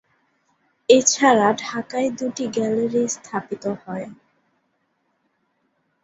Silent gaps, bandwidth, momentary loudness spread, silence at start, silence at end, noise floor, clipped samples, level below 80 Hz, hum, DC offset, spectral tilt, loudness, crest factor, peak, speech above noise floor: none; 8.2 kHz; 16 LU; 0.9 s; 1.9 s; -70 dBFS; under 0.1%; -66 dBFS; none; under 0.1%; -3 dB/octave; -20 LUFS; 22 dB; -2 dBFS; 50 dB